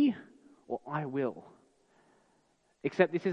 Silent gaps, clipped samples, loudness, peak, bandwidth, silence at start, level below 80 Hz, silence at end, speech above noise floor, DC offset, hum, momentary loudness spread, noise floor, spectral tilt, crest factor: none; under 0.1%; -34 LUFS; -10 dBFS; 8 kHz; 0 s; -82 dBFS; 0 s; 40 dB; under 0.1%; none; 14 LU; -72 dBFS; -8 dB/octave; 24 dB